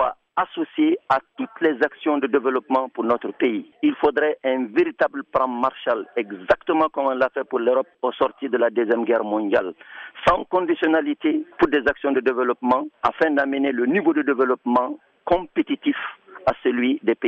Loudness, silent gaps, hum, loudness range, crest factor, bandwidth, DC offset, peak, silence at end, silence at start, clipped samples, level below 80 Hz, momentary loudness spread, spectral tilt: -22 LUFS; none; none; 1 LU; 16 dB; 6.8 kHz; under 0.1%; -6 dBFS; 0 s; 0 s; under 0.1%; -54 dBFS; 5 LU; -6.5 dB/octave